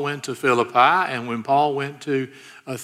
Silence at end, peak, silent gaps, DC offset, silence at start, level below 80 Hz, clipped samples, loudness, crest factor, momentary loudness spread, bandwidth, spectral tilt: 0 s; -4 dBFS; none; under 0.1%; 0 s; -74 dBFS; under 0.1%; -20 LUFS; 18 dB; 15 LU; 15 kHz; -5 dB/octave